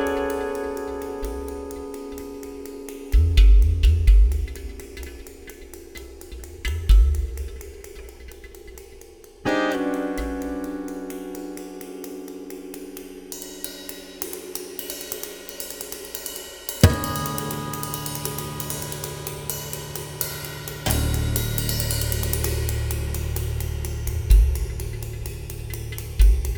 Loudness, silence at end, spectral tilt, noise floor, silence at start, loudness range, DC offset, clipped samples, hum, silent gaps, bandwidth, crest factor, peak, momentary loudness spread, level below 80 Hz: -25 LUFS; 0 s; -5 dB/octave; -45 dBFS; 0 s; 11 LU; under 0.1%; under 0.1%; none; none; over 20 kHz; 24 dB; 0 dBFS; 20 LU; -24 dBFS